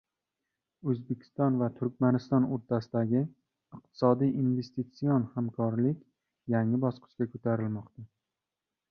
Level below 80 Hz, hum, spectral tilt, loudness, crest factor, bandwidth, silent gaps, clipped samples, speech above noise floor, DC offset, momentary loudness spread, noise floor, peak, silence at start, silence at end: -70 dBFS; none; -10 dB/octave; -30 LUFS; 20 dB; 6.2 kHz; none; under 0.1%; 60 dB; under 0.1%; 11 LU; -89 dBFS; -10 dBFS; 0.85 s; 0.85 s